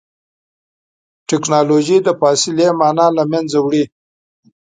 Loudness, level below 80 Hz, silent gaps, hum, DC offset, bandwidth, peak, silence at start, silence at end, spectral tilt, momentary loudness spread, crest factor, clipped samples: -14 LUFS; -64 dBFS; none; none; under 0.1%; 9.6 kHz; 0 dBFS; 1.3 s; 0.85 s; -4.5 dB/octave; 7 LU; 16 dB; under 0.1%